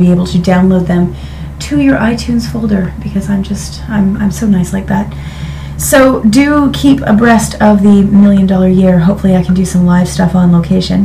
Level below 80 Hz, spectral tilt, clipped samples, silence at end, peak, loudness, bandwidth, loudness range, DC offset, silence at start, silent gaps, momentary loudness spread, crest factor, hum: -26 dBFS; -6.5 dB/octave; 0.7%; 0 s; 0 dBFS; -9 LUFS; 15.5 kHz; 6 LU; under 0.1%; 0 s; none; 10 LU; 8 dB; none